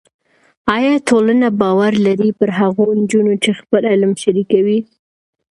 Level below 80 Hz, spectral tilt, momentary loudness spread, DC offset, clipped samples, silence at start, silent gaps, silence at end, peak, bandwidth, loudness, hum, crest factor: -56 dBFS; -6 dB/octave; 4 LU; under 0.1%; under 0.1%; 0.65 s; none; 0.65 s; 0 dBFS; 11.5 kHz; -14 LUFS; none; 14 dB